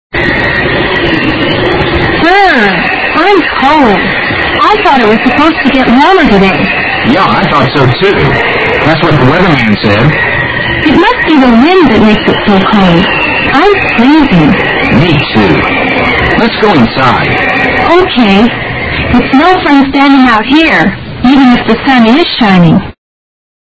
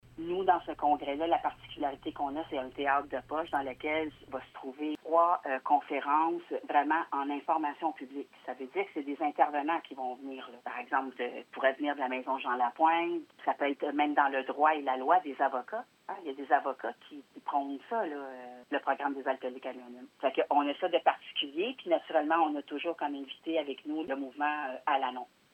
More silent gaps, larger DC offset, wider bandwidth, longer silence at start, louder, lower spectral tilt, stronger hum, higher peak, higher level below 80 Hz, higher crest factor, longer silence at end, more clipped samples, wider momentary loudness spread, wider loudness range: neither; neither; about the same, 8 kHz vs 8.4 kHz; about the same, 0.15 s vs 0.15 s; first, -6 LUFS vs -32 LUFS; first, -7 dB/octave vs -5.5 dB/octave; neither; first, 0 dBFS vs -12 dBFS; first, -26 dBFS vs -70 dBFS; second, 6 dB vs 22 dB; first, 0.8 s vs 0.3 s; first, 3% vs under 0.1%; second, 4 LU vs 13 LU; second, 1 LU vs 5 LU